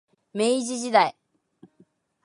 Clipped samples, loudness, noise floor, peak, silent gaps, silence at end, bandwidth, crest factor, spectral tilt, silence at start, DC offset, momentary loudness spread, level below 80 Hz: under 0.1%; -23 LUFS; -62 dBFS; -4 dBFS; none; 1.15 s; 11.5 kHz; 22 dB; -3 dB/octave; 0.35 s; under 0.1%; 5 LU; -80 dBFS